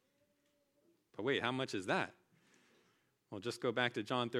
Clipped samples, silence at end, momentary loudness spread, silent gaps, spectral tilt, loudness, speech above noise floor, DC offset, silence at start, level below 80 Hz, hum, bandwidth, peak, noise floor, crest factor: under 0.1%; 0 s; 10 LU; none; -4.5 dB/octave; -38 LUFS; 41 dB; under 0.1%; 1.2 s; -88 dBFS; none; 15 kHz; -18 dBFS; -78 dBFS; 24 dB